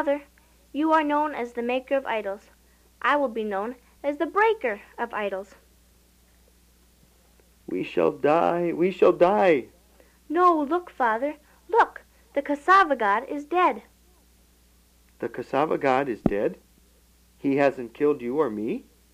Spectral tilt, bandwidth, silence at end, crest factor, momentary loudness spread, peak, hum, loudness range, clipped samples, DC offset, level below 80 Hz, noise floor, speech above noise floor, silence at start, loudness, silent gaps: -6.5 dB/octave; 15.5 kHz; 0.35 s; 20 dB; 13 LU; -6 dBFS; none; 6 LU; under 0.1%; under 0.1%; -58 dBFS; -59 dBFS; 35 dB; 0 s; -24 LUFS; none